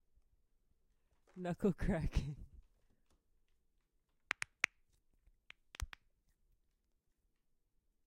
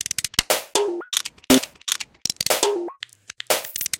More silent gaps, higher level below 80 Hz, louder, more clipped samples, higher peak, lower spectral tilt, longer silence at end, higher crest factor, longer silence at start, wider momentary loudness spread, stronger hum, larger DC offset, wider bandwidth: neither; about the same, -52 dBFS vs -52 dBFS; second, -41 LUFS vs -22 LUFS; neither; second, -12 dBFS vs 0 dBFS; first, -5.5 dB/octave vs -1.5 dB/octave; first, 2.15 s vs 0 s; first, 34 dB vs 24 dB; first, 1.35 s vs 0.2 s; first, 17 LU vs 12 LU; neither; neither; about the same, 16 kHz vs 17.5 kHz